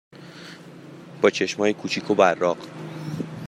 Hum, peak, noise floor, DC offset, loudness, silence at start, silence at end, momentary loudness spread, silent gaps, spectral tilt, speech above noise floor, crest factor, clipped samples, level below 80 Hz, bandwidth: none; -4 dBFS; -43 dBFS; under 0.1%; -23 LUFS; 0.15 s; 0 s; 23 LU; none; -5 dB/octave; 21 dB; 22 dB; under 0.1%; -70 dBFS; 13 kHz